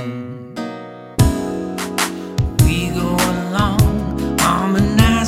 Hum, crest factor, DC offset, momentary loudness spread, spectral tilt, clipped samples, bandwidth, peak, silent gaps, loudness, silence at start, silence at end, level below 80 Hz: none; 16 dB; under 0.1%; 13 LU; -5.5 dB/octave; under 0.1%; 16.5 kHz; 0 dBFS; none; -18 LUFS; 0 s; 0 s; -26 dBFS